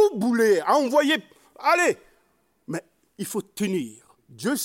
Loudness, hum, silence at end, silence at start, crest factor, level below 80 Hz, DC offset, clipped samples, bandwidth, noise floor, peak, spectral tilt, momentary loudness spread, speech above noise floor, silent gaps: -23 LUFS; none; 0 s; 0 s; 18 dB; -72 dBFS; under 0.1%; under 0.1%; 16.5 kHz; -67 dBFS; -6 dBFS; -4 dB/octave; 15 LU; 44 dB; none